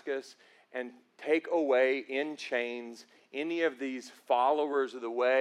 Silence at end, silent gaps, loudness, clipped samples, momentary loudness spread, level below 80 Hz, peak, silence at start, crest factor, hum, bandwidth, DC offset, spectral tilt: 0 s; none; -31 LUFS; under 0.1%; 15 LU; under -90 dBFS; -14 dBFS; 0.05 s; 16 dB; none; 12 kHz; under 0.1%; -3.5 dB/octave